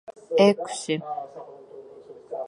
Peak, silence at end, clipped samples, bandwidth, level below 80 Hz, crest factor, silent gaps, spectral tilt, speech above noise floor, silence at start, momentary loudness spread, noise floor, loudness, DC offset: -4 dBFS; 0 s; under 0.1%; 11.5 kHz; -78 dBFS; 22 dB; none; -5 dB/octave; 23 dB; 0.1 s; 25 LU; -46 dBFS; -24 LUFS; under 0.1%